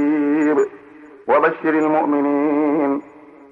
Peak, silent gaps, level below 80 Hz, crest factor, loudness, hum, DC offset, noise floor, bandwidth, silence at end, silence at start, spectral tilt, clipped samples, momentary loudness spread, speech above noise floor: -4 dBFS; none; -70 dBFS; 14 dB; -18 LUFS; none; under 0.1%; -42 dBFS; 7.4 kHz; 0.5 s; 0 s; -7.5 dB/octave; under 0.1%; 6 LU; 25 dB